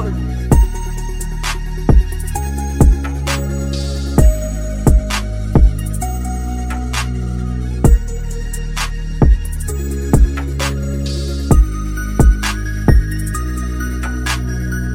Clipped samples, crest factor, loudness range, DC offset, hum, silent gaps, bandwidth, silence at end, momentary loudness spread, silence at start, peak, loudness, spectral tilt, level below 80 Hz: under 0.1%; 14 dB; 2 LU; under 0.1%; none; none; 16.5 kHz; 0 s; 8 LU; 0 s; 0 dBFS; -18 LUFS; -6 dB/octave; -16 dBFS